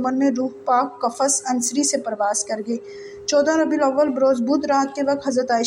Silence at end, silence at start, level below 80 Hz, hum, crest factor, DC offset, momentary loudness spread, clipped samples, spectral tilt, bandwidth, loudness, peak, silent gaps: 0 s; 0 s; -64 dBFS; none; 14 dB; under 0.1%; 7 LU; under 0.1%; -2.5 dB/octave; 16 kHz; -20 LUFS; -6 dBFS; none